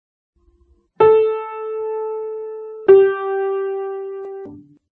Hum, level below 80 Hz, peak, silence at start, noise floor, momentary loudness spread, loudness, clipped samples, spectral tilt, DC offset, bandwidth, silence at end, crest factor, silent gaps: none; -64 dBFS; -2 dBFS; 1 s; -57 dBFS; 19 LU; -18 LUFS; under 0.1%; -9.5 dB/octave; under 0.1%; 3.8 kHz; 0.4 s; 18 dB; none